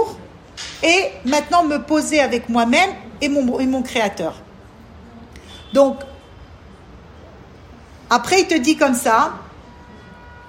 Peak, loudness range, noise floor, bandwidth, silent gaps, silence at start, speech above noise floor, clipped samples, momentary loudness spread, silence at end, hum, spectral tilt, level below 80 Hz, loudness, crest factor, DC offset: -2 dBFS; 7 LU; -42 dBFS; 16 kHz; none; 0 s; 25 dB; under 0.1%; 18 LU; 0 s; none; -3 dB/octave; -48 dBFS; -17 LUFS; 18 dB; under 0.1%